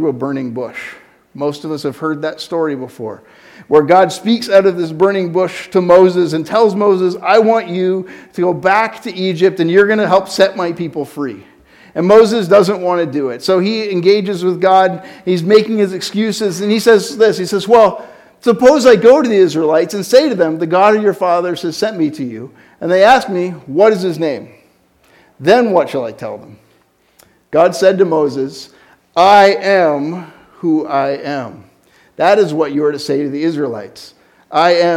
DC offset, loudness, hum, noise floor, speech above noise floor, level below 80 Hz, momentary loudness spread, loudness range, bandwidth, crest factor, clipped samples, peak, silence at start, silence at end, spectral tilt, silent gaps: under 0.1%; -13 LUFS; none; -54 dBFS; 42 dB; -56 dBFS; 14 LU; 6 LU; 16 kHz; 12 dB; 0.3%; 0 dBFS; 0 s; 0 s; -5.5 dB/octave; none